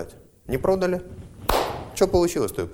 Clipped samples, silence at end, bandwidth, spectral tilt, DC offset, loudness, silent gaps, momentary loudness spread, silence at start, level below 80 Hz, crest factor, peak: under 0.1%; 0 s; over 20 kHz; -5 dB/octave; under 0.1%; -24 LUFS; none; 10 LU; 0 s; -40 dBFS; 20 dB; -6 dBFS